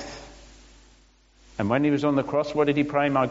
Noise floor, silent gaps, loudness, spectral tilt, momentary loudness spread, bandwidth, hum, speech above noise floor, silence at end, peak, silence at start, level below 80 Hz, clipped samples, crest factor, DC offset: -57 dBFS; none; -24 LUFS; -5.5 dB/octave; 17 LU; 7.8 kHz; none; 35 dB; 0 s; -8 dBFS; 0 s; -54 dBFS; under 0.1%; 18 dB; under 0.1%